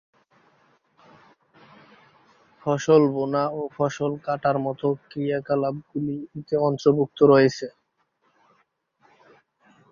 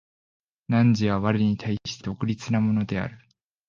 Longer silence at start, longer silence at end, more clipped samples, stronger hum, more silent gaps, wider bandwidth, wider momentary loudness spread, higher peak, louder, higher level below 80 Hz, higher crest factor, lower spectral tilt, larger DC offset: first, 2.65 s vs 0.7 s; first, 2.2 s vs 0.5 s; neither; neither; neither; about the same, 7.2 kHz vs 7.4 kHz; about the same, 12 LU vs 10 LU; about the same, -4 dBFS vs -6 dBFS; about the same, -23 LUFS vs -25 LUFS; second, -66 dBFS vs -52 dBFS; about the same, 20 dB vs 18 dB; about the same, -7 dB/octave vs -7 dB/octave; neither